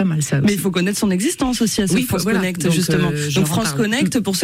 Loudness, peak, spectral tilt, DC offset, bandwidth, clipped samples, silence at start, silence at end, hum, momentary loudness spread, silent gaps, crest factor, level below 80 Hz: -18 LUFS; -8 dBFS; -4.5 dB/octave; under 0.1%; 16 kHz; under 0.1%; 0 s; 0 s; none; 2 LU; none; 10 dB; -44 dBFS